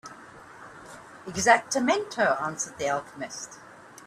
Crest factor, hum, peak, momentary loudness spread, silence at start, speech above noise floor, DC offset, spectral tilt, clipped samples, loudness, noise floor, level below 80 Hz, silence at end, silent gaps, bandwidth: 24 dB; none; -4 dBFS; 25 LU; 0.05 s; 21 dB; under 0.1%; -2.5 dB/octave; under 0.1%; -26 LUFS; -47 dBFS; -64 dBFS; 0.05 s; none; 14 kHz